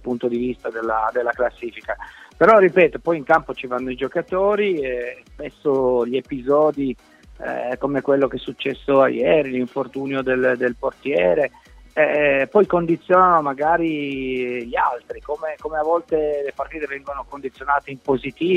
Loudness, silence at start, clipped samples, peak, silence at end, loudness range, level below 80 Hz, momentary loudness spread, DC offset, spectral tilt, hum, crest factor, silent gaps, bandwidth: -20 LUFS; 0.05 s; under 0.1%; -2 dBFS; 0 s; 5 LU; -48 dBFS; 13 LU; under 0.1%; -7.5 dB/octave; none; 18 dB; none; 8.8 kHz